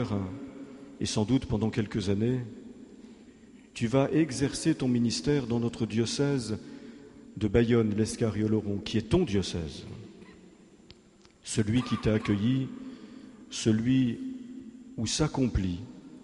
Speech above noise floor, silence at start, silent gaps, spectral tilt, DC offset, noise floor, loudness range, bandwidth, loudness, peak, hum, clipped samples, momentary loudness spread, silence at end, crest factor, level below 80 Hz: 30 dB; 0 s; none; -6 dB/octave; under 0.1%; -58 dBFS; 3 LU; 11.5 kHz; -29 LUFS; -10 dBFS; none; under 0.1%; 20 LU; 0.05 s; 20 dB; -48 dBFS